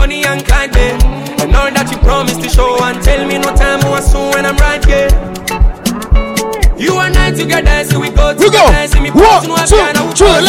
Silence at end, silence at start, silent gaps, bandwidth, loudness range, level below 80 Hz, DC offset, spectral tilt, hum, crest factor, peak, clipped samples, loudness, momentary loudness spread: 0 s; 0 s; none; 16 kHz; 4 LU; -12 dBFS; under 0.1%; -4.5 dB/octave; none; 8 dB; 0 dBFS; 0.3%; -10 LUFS; 7 LU